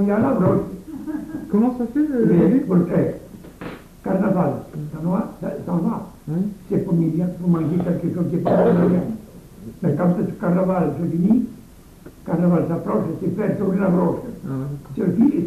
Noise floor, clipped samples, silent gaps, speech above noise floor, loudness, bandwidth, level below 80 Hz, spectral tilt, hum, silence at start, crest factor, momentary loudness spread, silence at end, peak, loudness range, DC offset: -44 dBFS; under 0.1%; none; 24 dB; -21 LUFS; 13.5 kHz; -48 dBFS; -10 dB/octave; none; 0 s; 16 dB; 13 LU; 0 s; -4 dBFS; 4 LU; under 0.1%